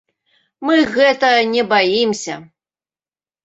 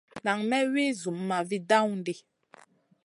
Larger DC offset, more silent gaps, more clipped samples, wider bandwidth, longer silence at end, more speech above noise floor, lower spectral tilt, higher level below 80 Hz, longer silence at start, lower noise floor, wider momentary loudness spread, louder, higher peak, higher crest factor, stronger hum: neither; neither; neither; second, 8.2 kHz vs 11.5 kHz; first, 1 s vs 0.85 s; first, over 75 dB vs 30 dB; about the same, -3.5 dB/octave vs -4.5 dB/octave; first, -60 dBFS vs -78 dBFS; first, 0.6 s vs 0.15 s; first, under -90 dBFS vs -58 dBFS; first, 13 LU vs 10 LU; first, -15 LUFS vs -28 LUFS; first, -2 dBFS vs -10 dBFS; about the same, 16 dB vs 20 dB; neither